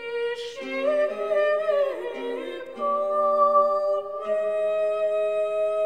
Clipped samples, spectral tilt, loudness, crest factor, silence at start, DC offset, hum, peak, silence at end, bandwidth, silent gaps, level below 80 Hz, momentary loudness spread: under 0.1%; -3.5 dB/octave; -24 LUFS; 16 dB; 0 s; 0.2%; none; -8 dBFS; 0 s; 9.4 kHz; none; -70 dBFS; 11 LU